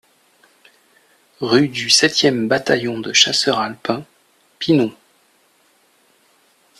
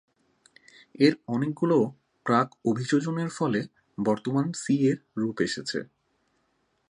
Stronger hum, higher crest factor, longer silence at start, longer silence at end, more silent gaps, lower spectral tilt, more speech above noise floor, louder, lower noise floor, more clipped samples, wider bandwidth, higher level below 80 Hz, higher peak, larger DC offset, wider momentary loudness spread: neither; about the same, 20 dB vs 20 dB; first, 1.4 s vs 1 s; first, 1.9 s vs 1.05 s; neither; second, -3 dB/octave vs -6 dB/octave; second, 41 dB vs 46 dB; first, -16 LUFS vs -27 LUFS; second, -58 dBFS vs -72 dBFS; neither; first, 14 kHz vs 11 kHz; first, -62 dBFS vs -70 dBFS; first, 0 dBFS vs -6 dBFS; neither; first, 12 LU vs 8 LU